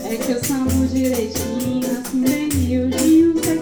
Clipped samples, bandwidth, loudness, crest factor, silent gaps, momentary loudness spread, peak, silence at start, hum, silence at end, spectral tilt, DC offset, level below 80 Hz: under 0.1%; over 20 kHz; -18 LUFS; 12 dB; none; 8 LU; -6 dBFS; 0 s; none; 0 s; -5 dB/octave; under 0.1%; -38 dBFS